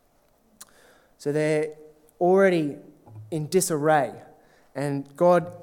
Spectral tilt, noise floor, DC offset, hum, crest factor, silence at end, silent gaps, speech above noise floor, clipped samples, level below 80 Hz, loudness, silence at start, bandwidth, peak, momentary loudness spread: -5.5 dB/octave; -63 dBFS; under 0.1%; none; 18 dB; 0 s; none; 40 dB; under 0.1%; -70 dBFS; -24 LUFS; 1.2 s; 18 kHz; -8 dBFS; 14 LU